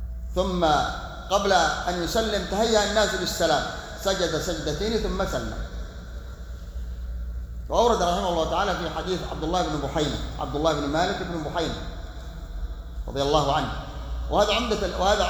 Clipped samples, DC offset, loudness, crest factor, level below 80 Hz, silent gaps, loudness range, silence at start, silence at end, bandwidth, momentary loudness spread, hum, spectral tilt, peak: under 0.1%; under 0.1%; -25 LUFS; 18 dB; -34 dBFS; none; 5 LU; 0 s; 0 s; over 20 kHz; 16 LU; none; -4 dB/octave; -6 dBFS